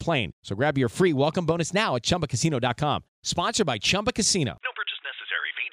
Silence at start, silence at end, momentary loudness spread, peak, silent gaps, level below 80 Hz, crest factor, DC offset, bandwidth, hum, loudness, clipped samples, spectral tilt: 0 s; 0 s; 7 LU; -10 dBFS; 0.33-0.42 s, 3.08-3.23 s; -52 dBFS; 16 dB; under 0.1%; 15.5 kHz; none; -25 LUFS; under 0.1%; -4 dB/octave